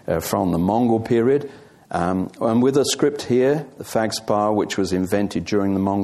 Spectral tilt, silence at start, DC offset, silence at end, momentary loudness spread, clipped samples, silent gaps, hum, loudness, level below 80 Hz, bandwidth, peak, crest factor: -5.5 dB/octave; 0.05 s; under 0.1%; 0 s; 5 LU; under 0.1%; none; none; -20 LUFS; -54 dBFS; 15 kHz; -4 dBFS; 16 dB